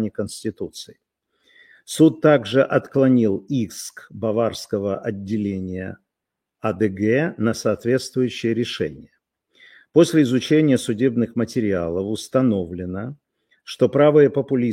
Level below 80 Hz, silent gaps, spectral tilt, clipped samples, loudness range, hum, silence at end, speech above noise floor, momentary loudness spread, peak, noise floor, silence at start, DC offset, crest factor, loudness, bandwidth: -58 dBFS; none; -6.5 dB/octave; under 0.1%; 5 LU; none; 0 s; 63 dB; 14 LU; -2 dBFS; -83 dBFS; 0 s; under 0.1%; 18 dB; -20 LUFS; 16 kHz